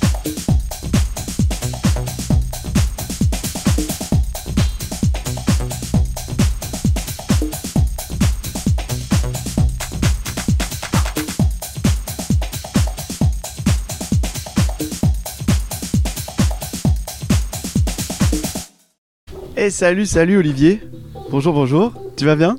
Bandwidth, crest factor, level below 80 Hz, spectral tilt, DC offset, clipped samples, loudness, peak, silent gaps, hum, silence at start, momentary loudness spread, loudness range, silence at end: 16.5 kHz; 18 dB; -24 dBFS; -5.5 dB/octave; under 0.1%; under 0.1%; -19 LUFS; 0 dBFS; 18.98-19.27 s; none; 0 s; 7 LU; 3 LU; 0 s